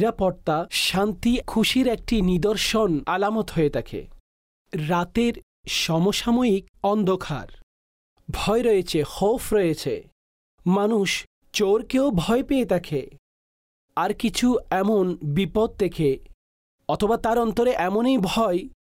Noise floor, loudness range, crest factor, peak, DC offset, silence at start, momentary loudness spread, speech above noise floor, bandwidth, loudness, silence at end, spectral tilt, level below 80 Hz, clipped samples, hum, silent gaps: under -90 dBFS; 2 LU; 12 dB; -12 dBFS; under 0.1%; 0 s; 9 LU; over 68 dB; 16 kHz; -23 LUFS; 0.1 s; -5 dB/octave; -42 dBFS; under 0.1%; none; 4.20-4.65 s, 5.43-5.63 s, 6.69-6.74 s, 7.63-8.16 s, 10.12-10.58 s, 11.27-11.42 s, 13.19-13.89 s, 16.34-16.79 s